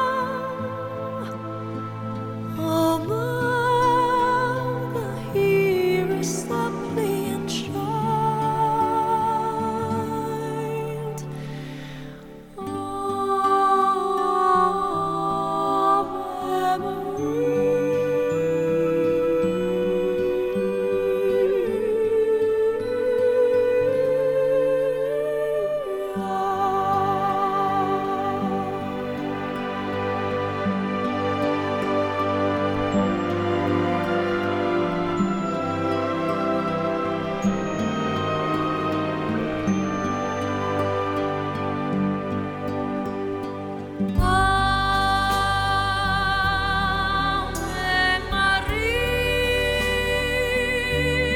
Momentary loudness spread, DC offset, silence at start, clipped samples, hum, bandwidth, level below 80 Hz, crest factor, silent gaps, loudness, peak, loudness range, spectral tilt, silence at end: 8 LU; under 0.1%; 0 s; under 0.1%; none; 17.5 kHz; -40 dBFS; 16 dB; none; -23 LUFS; -8 dBFS; 4 LU; -5.5 dB/octave; 0 s